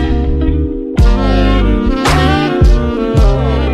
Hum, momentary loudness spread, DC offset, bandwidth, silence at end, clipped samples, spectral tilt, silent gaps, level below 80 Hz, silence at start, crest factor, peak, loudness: none; 4 LU; under 0.1%; 12 kHz; 0 s; under 0.1%; -7 dB/octave; none; -12 dBFS; 0 s; 10 dB; 0 dBFS; -12 LUFS